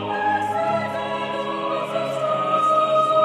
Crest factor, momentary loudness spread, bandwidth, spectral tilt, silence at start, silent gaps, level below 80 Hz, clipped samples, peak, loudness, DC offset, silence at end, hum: 14 dB; 8 LU; 13 kHz; -5 dB/octave; 0 s; none; -70 dBFS; under 0.1%; -8 dBFS; -22 LUFS; under 0.1%; 0 s; none